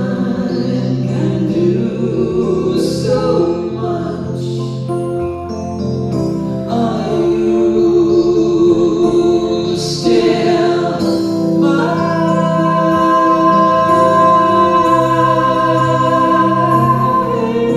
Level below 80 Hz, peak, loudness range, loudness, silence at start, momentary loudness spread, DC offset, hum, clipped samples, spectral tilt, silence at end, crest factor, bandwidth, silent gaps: -42 dBFS; 0 dBFS; 7 LU; -13 LUFS; 0 s; 8 LU; under 0.1%; none; under 0.1%; -7 dB/octave; 0 s; 12 dB; 12 kHz; none